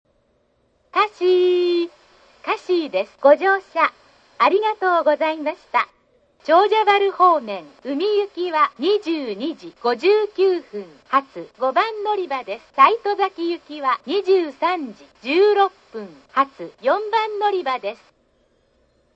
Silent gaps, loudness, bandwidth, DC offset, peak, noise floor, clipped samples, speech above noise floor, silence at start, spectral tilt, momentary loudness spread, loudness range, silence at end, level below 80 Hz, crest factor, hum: none; -20 LUFS; 7.6 kHz; under 0.1%; 0 dBFS; -64 dBFS; under 0.1%; 44 dB; 0.95 s; -4.5 dB/octave; 13 LU; 3 LU; 1.2 s; -70 dBFS; 20 dB; none